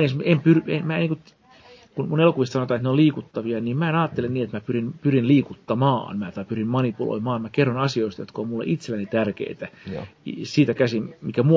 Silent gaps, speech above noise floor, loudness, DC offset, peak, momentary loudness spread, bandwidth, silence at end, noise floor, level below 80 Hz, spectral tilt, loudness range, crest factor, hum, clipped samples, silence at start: none; 28 dB; -23 LUFS; under 0.1%; -4 dBFS; 12 LU; 7.6 kHz; 0 s; -50 dBFS; -58 dBFS; -8 dB/octave; 3 LU; 18 dB; none; under 0.1%; 0 s